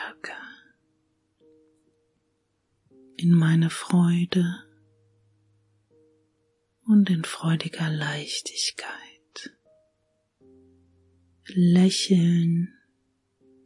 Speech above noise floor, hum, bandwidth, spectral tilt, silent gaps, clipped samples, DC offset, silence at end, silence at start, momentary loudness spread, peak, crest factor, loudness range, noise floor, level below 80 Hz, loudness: 51 dB; none; 11.5 kHz; -6 dB/octave; none; under 0.1%; under 0.1%; 1 s; 0 s; 22 LU; -8 dBFS; 18 dB; 8 LU; -73 dBFS; -72 dBFS; -23 LUFS